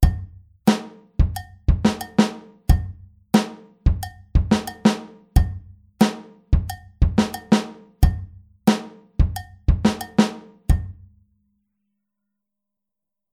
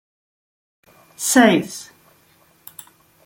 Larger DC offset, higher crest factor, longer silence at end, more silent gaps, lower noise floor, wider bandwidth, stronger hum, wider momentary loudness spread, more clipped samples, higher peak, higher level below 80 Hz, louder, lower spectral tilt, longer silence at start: neither; about the same, 20 dB vs 22 dB; first, 2.4 s vs 1.45 s; neither; first, -87 dBFS vs -56 dBFS; about the same, 16 kHz vs 17 kHz; neither; second, 14 LU vs 26 LU; neither; about the same, -2 dBFS vs -2 dBFS; first, -26 dBFS vs -64 dBFS; second, -22 LUFS vs -16 LUFS; first, -6.5 dB/octave vs -3.5 dB/octave; second, 0 s vs 1.2 s